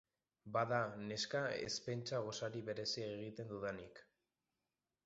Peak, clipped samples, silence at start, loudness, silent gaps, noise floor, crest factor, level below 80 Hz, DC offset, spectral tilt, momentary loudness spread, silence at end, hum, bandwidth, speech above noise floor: -22 dBFS; under 0.1%; 0.45 s; -43 LUFS; none; under -90 dBFS; 22 dB; -76 dBFS; under 0.1%; -3.5 dB/octave; 8 LU; 1 s; none; 8 kHz; over 47 dB